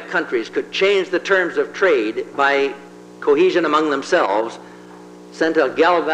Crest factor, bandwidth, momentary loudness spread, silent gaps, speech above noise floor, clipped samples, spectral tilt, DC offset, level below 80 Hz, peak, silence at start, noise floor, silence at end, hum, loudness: 16 dB; 9.8 kHz; 9 LU; none; 22 dB; under 0.1%; -4 dB/octave; under 0.1%; -66 dBFS; -2 dBFS; 0 s; -39 dBFS; 0 s; 60 Hz at -60 dBFS; -18 LUFS